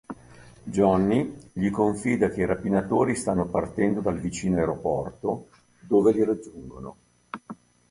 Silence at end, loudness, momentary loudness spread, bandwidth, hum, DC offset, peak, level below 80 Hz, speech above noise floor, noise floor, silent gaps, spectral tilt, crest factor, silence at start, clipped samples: 0.35 s; -25 LUFS; 20 LU; 11.5 kHz; none; under 0.1%; -6 dBFS; -50 dBFS; 25 dB; -49 dBFS; none; -7 dB/octave; 18 dB; 0.1 s; under 0.1%